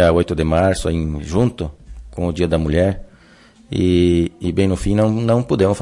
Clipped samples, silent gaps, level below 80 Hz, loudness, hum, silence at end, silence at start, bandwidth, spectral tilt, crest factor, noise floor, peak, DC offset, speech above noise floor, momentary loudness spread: under 0.1%; none; -34 dBFS; -18 LUFS; none; 0 s; 0 s; 11.5 kHz; -7 dB/octave; 14 dB; -47 dBFS; -4 dBFS; under 0.1%; 31 dB; 10 LU